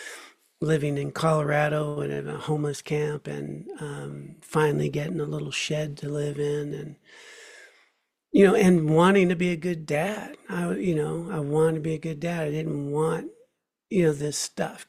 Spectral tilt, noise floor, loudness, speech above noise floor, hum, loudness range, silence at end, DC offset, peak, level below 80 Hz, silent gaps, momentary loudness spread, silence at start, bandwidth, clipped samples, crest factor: -6 dB/octave; -69 dBFS; -26 LUFS; 44 dB; none; 7 LU; 0.05 s; under 0.1%; -6 dBFS; -60 dBFS; none; 17 LU; 0 s; 15 kHz; under 0.1%; 20 dB